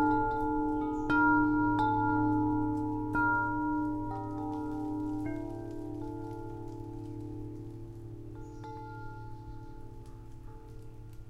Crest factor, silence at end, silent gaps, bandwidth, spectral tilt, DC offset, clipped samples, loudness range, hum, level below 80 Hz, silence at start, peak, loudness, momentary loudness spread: 18 dB; 0 s; none; 7 kHz; -8.5 dB/octave; under 0.1%; under 0.1%; 17 LU; none; -48 dBFS; 0 s; -16 dBFS; -32 LUFS; 21 LU